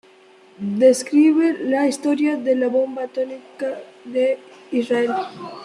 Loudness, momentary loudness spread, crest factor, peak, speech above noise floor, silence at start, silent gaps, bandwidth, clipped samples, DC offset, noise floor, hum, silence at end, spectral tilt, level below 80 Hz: -20 LUFS; 13 LU; 16 dB; -4 dBFS; 30 dB; 0.6 s; none; 12.5 kHz; under 0.1%; under 0.1%; -50 dBFS; none; 0 s; -5 dB/octave; -72 dBFS